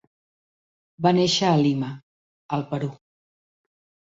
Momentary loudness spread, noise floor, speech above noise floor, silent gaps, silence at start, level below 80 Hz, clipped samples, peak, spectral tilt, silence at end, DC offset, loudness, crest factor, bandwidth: 14 LU; under -90 dBFS; over 68 dB; 2.03-2.49 s; 1 s; -64 dBFS; under 0.1%; -6 dBFS; -5.5 dB/octave; 1.2 s; under 0.1%; -23 LUFS; 20 dB; 8 kHz